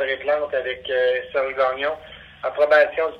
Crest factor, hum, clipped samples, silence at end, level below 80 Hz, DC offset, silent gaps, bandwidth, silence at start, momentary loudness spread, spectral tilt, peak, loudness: 18 dB; none; under 0.1%; 0 s; -58 dBFS; under 0.1%; none; 6.2 kHz; 0 s; 13 LU; -4.5 dB/octave; -4 dBFS; -21 LUFS